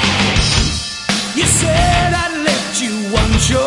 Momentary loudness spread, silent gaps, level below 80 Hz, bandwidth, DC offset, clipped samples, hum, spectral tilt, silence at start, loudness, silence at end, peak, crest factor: 6 LU; none; -24 dBFS; 11.5 kHz; under 0.1%; under 0.1%; none; -3.5 dB/octave; 0 s; -14 LUFS; 0 s; 0 dBFS; 14 dB